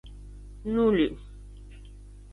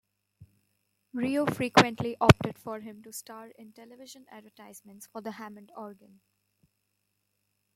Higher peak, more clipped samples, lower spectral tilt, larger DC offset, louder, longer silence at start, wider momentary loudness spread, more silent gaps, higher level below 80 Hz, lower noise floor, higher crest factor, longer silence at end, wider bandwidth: second, -12 dBFS vs -2 dBFS; neither; first, -7.5 dB/octave vs -5.5 dB/octave; neither; about the same, -26 LUFS vs -26 LUFS; second, 0.05 s vs 0.4 s; about the same, 25 LU vs 27 LU; neither; first, -44 dBFS vs -54 dBFS; second, -46 dBFS vs -79 dBFS; second, 18 dB vs 28 dB; second, 0 s vs 1.85 s; second, 11 kHz vs 16 kHz